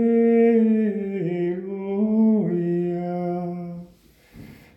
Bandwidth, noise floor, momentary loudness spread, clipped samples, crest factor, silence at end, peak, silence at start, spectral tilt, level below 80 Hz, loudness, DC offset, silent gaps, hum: 3.3 kHz; -53 dBFS; 13 LU; under 0.1%; 14 dB; 0.2 s; -8 dBFS; 0 s; -10.5 dB/octave; -62 dBFS; -22 LUFS; under 0.1%; none; none